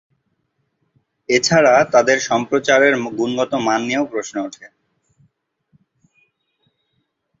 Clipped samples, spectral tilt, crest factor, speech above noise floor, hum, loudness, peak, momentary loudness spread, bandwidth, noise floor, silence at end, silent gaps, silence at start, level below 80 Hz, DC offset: under 0.1%; -3.5 dB/octave; 18 dB; 54 dB; none; -16 LUFS; 0 dBFS; 13 LU; 8 kHz; -70 dBFS; 2.75 s; none; 1.3 s; -60 dBFS; under 0.1%